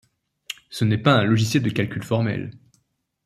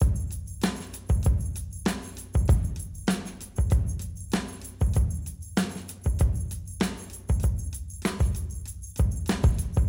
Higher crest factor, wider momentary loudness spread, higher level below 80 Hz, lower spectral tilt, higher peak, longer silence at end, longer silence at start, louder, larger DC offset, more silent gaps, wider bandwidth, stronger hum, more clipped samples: about the same, 20 dB vs 16 dB; first, 18 LU vs 11 LU; second, -58 dBFS vs -30 dBFS; about the same, -6 dB/octave vs -6 dB/octave; first, -4 dBFS vs -10 dBFS; first, 0.7 s vs 0 s; first, 0.5 s vs 0 s; first, -21 LUFS vs -29 LUFS; neither; neither; about the same, 15 kHz vs 16.5 kHz; neither; neither